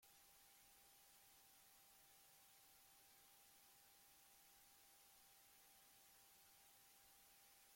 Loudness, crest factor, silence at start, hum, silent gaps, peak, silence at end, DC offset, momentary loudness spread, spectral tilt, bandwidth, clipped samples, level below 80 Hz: -68 LUFS; 14 dB; 0 s; none; none; -58 dBFS; 0 s; under 0.1%; 0 LU; 0 dB/octave; 16.5 kHz; under 0.1%; under -90 dBFS